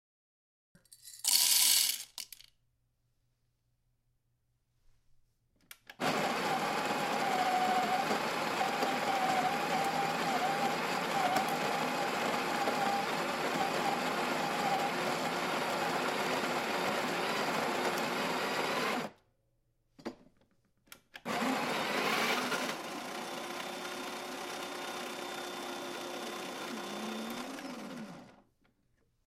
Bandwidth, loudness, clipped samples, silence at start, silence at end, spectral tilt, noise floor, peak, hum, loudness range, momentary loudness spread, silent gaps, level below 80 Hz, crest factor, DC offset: 16 kHz; -33 LUFS; under 0.1%; 0.9 s; 1 s; -2 dB/octave; -77 dBFS; -10 dBFS; none; 10 LU; 10 LU; none; -74 dBFS; 24 dB; under 0.1%